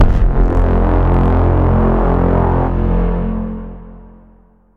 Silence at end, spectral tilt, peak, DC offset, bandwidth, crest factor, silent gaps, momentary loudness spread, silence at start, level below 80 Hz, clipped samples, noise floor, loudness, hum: 0.7 s; -10.5 dB/octave; -2 dBFS; under 0.1%; 3.6 kHz; 10 dB; none; 10 LU; 0 s; -16 dBFS; under 0.1%; -47 dBFS; -15 LUFS; none